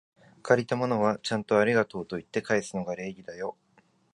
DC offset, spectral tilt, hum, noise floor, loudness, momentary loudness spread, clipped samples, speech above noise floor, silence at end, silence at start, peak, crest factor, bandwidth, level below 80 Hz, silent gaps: under 0.1%; -5.5 dB/octave; none; -65 dBFS; -28 LUFS; 13 LU; under 0.1%; 37 dB; 0.6 s; 0.45 s; -6 dBFS; 22 dB; 11.5 kHz; -66 dBFS; none